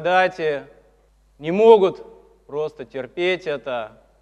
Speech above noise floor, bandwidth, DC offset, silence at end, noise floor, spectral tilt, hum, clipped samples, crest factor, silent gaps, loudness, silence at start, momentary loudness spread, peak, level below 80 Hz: 38 dB; 7.8 kHz; under 0.1%; 0.35 s; -57 dBFS; -6 dB/octave; none; under 0.1%; 20 dB; none; -20 LUFS; 0 s; 19 LU; 0 dBFS; -60 dBFS